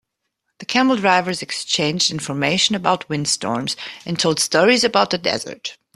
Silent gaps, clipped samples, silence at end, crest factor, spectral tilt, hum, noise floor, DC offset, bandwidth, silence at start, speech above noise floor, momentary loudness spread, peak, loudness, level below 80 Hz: none; under 0.1%; 0.25 s; 20 dB; -3 dB/octave; none; -75 dBFS; under 0.1%; 13.5 kHz; 0.6 s; 56 dB; 11 LU; 0 dBFS; -18 LUFS; -60 dBFS